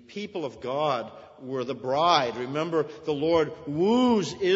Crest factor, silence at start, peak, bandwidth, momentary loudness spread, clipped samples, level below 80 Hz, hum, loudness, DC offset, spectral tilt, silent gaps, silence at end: 20 dB; 0.1 s; -6 dBFS; 8 kHz; 12 LU; under 0.1%; -64 dBFS; none; -26 LUFS; under 0.1%; -5.5 dB/octave; none; 0 s